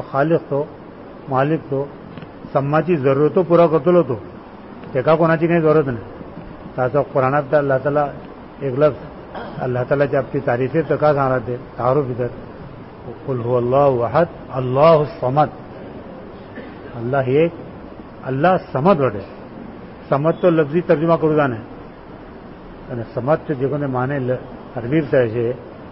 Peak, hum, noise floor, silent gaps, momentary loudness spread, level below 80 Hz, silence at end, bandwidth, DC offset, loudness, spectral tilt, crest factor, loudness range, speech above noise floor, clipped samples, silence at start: -2 dBFS; none; -37 dBFS; none; 21 LU; -48 dBFS; 0 s; 5.8 kHz; 0.1%; -18 LUFS; -12.5 dB/octave; 16 dB; 4 LU; 20 dB; under 0.1%; 0 s